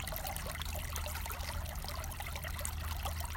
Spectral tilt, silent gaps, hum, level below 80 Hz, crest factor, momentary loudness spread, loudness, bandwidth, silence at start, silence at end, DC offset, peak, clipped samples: -3 dB/octave; none; none; -42 dBFS; 22 dB; 2 LU; -40 LUFS; 17 kHz; 0 s; 0 s; under 0.1%; -18 dBFS; under 0.1%